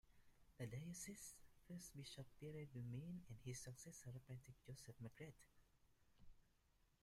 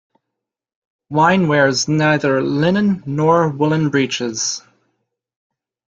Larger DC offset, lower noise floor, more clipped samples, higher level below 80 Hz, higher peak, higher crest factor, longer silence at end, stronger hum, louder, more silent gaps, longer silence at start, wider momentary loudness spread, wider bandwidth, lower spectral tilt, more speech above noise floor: neither; about the same, -80 dBFS vs -81 dBFS; neither; second, -76 dBFS vs -56 dBFS; second, -40 dBFS vs -2 dBFS; about the same, 16 dB vs 16 dB; second, 0.15 s vs 1.3 s; neither; second, -57 LUFS vs -16 LUFS; neither; second, 0.05 s vs 1.1 s; about the same, 7 LU vs 6 LU; first, 15.5 kHz vs 7.8 kHz; about the same, -5 dB/octave vs -5 dB/octave; second, 24 dB vs 65 dB